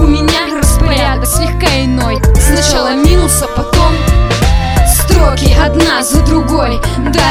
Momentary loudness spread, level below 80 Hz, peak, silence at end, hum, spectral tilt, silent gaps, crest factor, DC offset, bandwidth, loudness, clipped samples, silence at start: 3 LU; -12 dBFS; 0 dBFS; 0 s; none; -4.5 dB/octave; none; 8 dB; under 0.1%; 16 kHz; -10 LUFS; 0.5%; 0 s